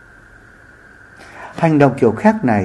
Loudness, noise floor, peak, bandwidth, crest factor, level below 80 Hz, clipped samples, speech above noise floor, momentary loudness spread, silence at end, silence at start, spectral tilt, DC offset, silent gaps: -14 LUFS; -44 dBFS; 0 dBFS; 11 kHz; 16 dB; -52 dBFS; under 0.1%; 30 dB; 19 LU; 0 s; 1.2 s; -8.5 dB/octave; under 0.1%; none